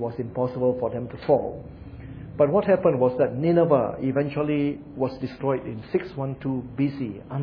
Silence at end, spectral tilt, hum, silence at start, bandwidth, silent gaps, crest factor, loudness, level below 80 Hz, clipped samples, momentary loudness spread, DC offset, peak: 0 s; -11 dB/octave; none; 0 s; 5.4 kHz; none; 18 dB; -25 LUFS; -52 dBFS; under 0.1%; 13 LU; under 0.1%; -6 dBFS